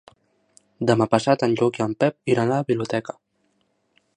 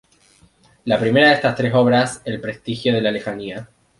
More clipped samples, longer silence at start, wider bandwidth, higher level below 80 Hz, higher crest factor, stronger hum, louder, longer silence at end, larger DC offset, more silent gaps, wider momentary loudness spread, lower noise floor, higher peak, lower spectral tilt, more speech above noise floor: neither; about the same, 0.8 s vs 0.85 s; about the same, 10.5 kHz vs 11.5 kHz; second, -62 dBFS vs -54 dBFS; about the same, 20 dB vs 18 dB; neither; second, -22 LUFS vs -18 LUFS; first, 1.15 s vs 0.35 s; neither; neither; second, 8 LU vs 16 LU; first, -69 dBFS vs -54 dBFS; about the same, -2 dBFS vs -2 dBFS; about the same, -6.5 dB/octave vs -5.5 dB/octave; first, 48 dB vs 36 dB